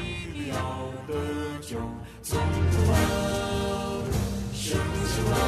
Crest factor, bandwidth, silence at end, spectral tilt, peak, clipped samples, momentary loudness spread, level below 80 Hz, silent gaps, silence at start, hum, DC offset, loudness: 16 dB; 14 kHz; 0 s; -5.5 dB/octave; -12 dBFS; under 0.1%; 10 LU; -38 dBFS; none; 0 s; none; under 0.1%; -28 LUFS